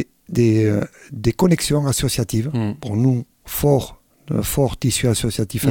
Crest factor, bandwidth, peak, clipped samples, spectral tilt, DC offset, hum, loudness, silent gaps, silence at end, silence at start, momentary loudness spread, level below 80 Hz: 16 dB; 18 kHz; -2 dBFS; under 0.1%; -5.5 dB/octave; under 0.1%; none; -19 LUFS; none; 0 s; 0 s; 8 LU; -38 dBFS